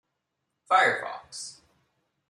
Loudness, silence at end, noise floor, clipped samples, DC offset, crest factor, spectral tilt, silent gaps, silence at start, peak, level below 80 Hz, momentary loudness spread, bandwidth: -24 LUFS; 0.75 s; -81 dBFS; under 0.1%; under 0.1%; 22 dB; -1.5 dB/octave; none; 0.7 s; -8 dBFS; -78 dBFS; 17 LU; 12 kHz